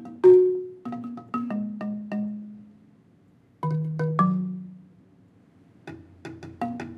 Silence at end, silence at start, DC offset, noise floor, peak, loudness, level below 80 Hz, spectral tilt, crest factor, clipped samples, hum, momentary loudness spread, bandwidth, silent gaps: 0 s; 0 s; under 0.1%; -58 dBFS; -6 dBFS; -25 LUFS; -70 dBFS; -10 dB/octave; 20 dB; under 0.1%; none; 26 LU; 5.2 kHz; none